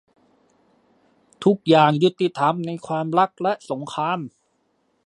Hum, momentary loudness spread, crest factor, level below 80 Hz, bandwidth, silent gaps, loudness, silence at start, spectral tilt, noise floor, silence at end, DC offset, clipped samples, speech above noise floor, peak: none; 12 LU; 20 dB; -70 dBFS; 11 kHz; none; -21 LUFS; 1.4 s; -6.5 dB/octave; -68 dBFS; 0.75 s; under 0.1%; under 0.1%; 47 dB; -2 dBFS